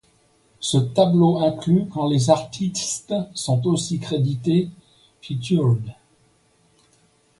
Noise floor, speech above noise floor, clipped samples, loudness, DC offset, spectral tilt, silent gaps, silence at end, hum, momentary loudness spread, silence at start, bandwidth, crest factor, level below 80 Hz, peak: -60 dBFS; 40 dB; under 0.1%; -21 LUFS; under 0.1%; -6 dB/octave; none; 1.45 s; none; 9 LU; 0.6 s; 11.5 kHz; 20 dB; -58 dBFS; -2 dBFS